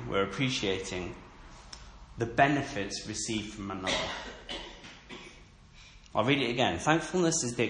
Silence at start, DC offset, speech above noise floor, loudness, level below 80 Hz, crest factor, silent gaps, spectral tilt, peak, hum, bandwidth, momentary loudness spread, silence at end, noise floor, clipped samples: 0 s; under 0.1%; 24 dB; -30 LUFS; -54 dBFS; 22 dB; none; -4 dB/octave; -10 dBFS; none; 11 kHz; 22 LU; 0 s; -54 dBFS; under 0.1%